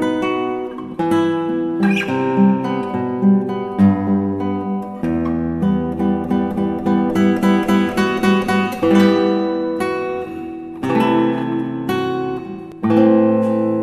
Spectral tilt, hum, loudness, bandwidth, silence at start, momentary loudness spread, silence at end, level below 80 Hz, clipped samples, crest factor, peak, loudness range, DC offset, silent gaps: -7.5 dB/octave; none; -17 LUFS; 13.5 kHz; 0 s; 9 LU; 0 s; -48 dBFS; under 0.1%; 16 dB; 0 dBFS; 3 LU; under 0.1%; none